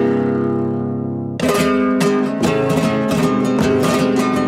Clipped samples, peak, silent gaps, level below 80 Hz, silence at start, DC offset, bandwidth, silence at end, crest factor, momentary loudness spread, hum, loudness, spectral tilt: under 0.1%; -2 dBFS; none; -46 dBFS; 0 s; under 0.1%; 16 kHz; 0 s; 14 dB; 5 LU; none; -17 LUFS; -6 dB/octave